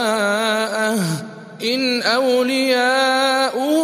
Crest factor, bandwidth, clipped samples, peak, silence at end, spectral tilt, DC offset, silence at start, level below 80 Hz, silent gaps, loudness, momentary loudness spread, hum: 14 dB; 15.5 kHz; under 0.1%; -4 dBFS; 0 s; -3.5 dB/octave; under 0.1%; 0 s; -72 dBFS; none; -18 LUFS; 7 LU; none